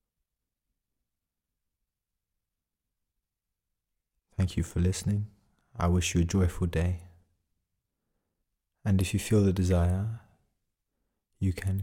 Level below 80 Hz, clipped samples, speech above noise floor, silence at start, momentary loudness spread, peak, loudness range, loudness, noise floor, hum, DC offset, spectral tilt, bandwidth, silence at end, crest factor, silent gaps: -50 dBFS; under 0.1%; 60 dB; 4.4 s; 12 LU; -14 dBFS; 5 LU; -29 LUFS; -87 dBFS; none; under 0.1%; -6.5 dB/octave; 16 kHz; 0 s; 18 dB; none